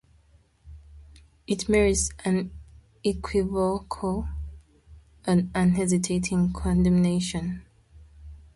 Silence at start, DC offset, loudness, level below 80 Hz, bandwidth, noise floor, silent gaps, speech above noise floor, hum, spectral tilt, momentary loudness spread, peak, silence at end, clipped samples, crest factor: 0.65 s; under 0.1%; -25 LUFS; -40 dBFS; 11.5 kHz; -60 dBFS; none; 36 dB; none; -5.5 dB/octave; 13 LU; -10 dBFS; 0.2 s; under 0.1%; 16 dB